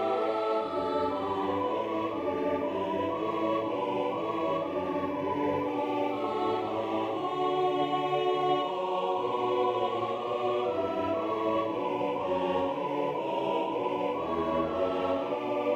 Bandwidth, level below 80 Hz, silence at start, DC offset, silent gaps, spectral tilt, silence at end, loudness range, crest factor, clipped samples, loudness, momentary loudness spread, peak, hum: 13.5 kHz; -64 dBFS; 0 s; under 0.1%; none; -6.5 dB/octave; 0 s; 2 LU; 16 dB; under 0.1%; -30 LUFS; 3 LU; -14 dBFS; none